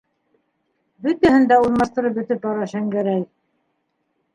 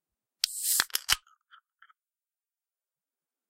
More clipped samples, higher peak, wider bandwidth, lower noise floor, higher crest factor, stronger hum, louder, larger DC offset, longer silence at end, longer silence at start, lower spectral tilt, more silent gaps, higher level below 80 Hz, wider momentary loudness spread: neither; first, -2 dBFS vs -8 dBFS; second, 11 kHz vs 16 kHz; second, -71 dBFS vs under -90 dBFS; second, 18 dB vs 28 dB; neither; first, -19 LUFS vs -28 LUFS; neither; second, 1.1 s vs 2.3 s; first, 1 s vs 0.45 s; first, -7 dB/octave vs 2.5 dB/octave; neither; first, -52 dBFS vs -62 dBFS; first, 11 LU vs 6 LU